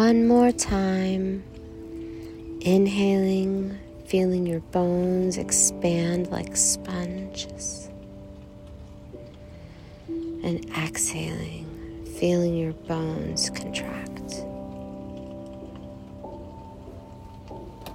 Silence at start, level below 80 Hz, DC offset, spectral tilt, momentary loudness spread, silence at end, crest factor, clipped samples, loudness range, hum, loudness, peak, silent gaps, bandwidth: 0 s; -48 dBFS; under 0.1%; -4.5 dB/octave; 22 LU; 0 s; 20 dB; under 0.1%; 14 LU; none; -25 LUFS; -6 dBFS; none; 16 kHz